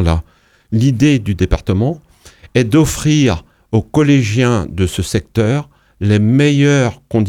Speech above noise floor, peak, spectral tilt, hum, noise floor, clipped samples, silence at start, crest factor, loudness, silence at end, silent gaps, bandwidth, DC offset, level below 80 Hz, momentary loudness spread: 30 dB; 0 dBFS; -6.5 dB/octave; none; -43 dBFS; under 0.1%; 0 s; 14 dB; -14 LUFS; 0 s; none; 15.5 kHz; under 0.1%; -30 dBFS; 8 LU